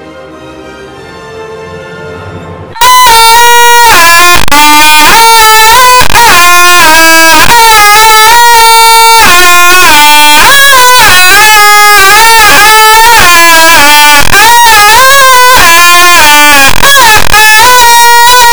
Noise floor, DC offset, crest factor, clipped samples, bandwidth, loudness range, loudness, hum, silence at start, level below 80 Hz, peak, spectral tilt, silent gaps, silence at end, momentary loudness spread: -24 dBFS; 30%; 4 dB; 80%; over 20 kHz; 3 LU; 1 LUFS; none; 0 s; -26 dBFS; 0 dBFS; 0 dB/octave; none; 0 s; 1 LU